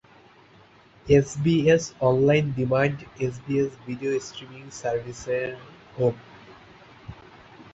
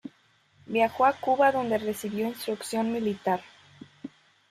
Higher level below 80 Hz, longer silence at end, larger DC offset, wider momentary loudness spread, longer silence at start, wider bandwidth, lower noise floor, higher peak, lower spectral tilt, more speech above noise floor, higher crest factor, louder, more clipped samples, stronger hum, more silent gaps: first, -52 dBFS vs -70 dBFS; second, 0.1 s vs 0.45 s; neither; about the same, 22 LU vs 22 LU; first, 1.05 s vs 0.05 s; second, 8.2 kHz vs 15.5 kHz; second, -54 dBFS vs -64 dBFS; first, -6 dBFS vs -10 dBFS; first, -6.5 dB/octave vs -5 dB/octave; second, 30 dB vs 38 dB; about the same, 20 dB vs 18 dB; first, -24 LUFS vs -27 LUFS; neither; neither; neither